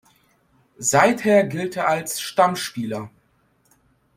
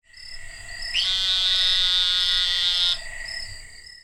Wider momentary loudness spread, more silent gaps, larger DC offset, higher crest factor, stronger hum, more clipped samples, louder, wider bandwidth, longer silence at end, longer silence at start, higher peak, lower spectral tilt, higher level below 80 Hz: second, 13 LU vs 20 LU; neither; neither; first, 22 dB vs 16 dB; neither; neither; about the same, -20 LUFS vs -19 LUFS; about the same, 16.5 kHz vs 16.5 kHz; first, 1.1 s vs 0.05 s; first, 0.8 s vs 0.15 s; first, 0 dBFS vs -8 dBFS; first, -4 dB/octave vs 1.5 dB/octave; second, -64 dBFS vs -42 dBFS